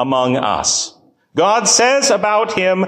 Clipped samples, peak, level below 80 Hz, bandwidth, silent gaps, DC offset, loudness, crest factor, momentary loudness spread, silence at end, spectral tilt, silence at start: under 0.1%; 0 dBFS; -52 dBFS; 15.5 kHz; none; under 0.1%; -14 LUFS; 14 dB; 7 LU; 0 s; -2 dB/octave; 0 s